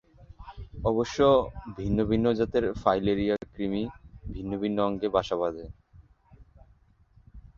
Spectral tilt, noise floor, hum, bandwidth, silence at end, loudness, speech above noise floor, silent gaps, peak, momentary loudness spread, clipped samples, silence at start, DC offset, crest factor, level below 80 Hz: -7 dB/octave; -61 dBFS; none; 7.4 kHz; 0.15 s; -27 LUFS; 34 dB; none; -6 dBFS; 19 LU; under 0.1%; 0.2 s; under 0.1%; 22 dB; -46 dBFS